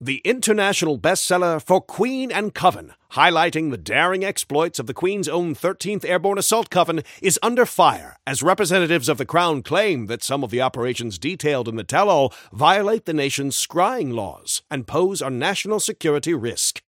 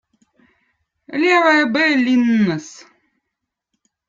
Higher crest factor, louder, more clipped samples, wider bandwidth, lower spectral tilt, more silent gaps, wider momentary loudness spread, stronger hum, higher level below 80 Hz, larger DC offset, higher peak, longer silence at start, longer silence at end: about the same, 20 dB vs 18 dB; second, -20 LUFS vs -15 LUFS; neither; first, 17 kHz vs 7.6 kHz; second, -3.5 dB/octave vs -5 dB/octave; neither; second, 7 LU vs 15 LU; neither; first, -60 dBFS vs -66 dBFS; neither; about the same, 0 dBFS vs -2 dBFS; second, 0 s vs 1.1 s; second, 0.1 s vs 1.35 s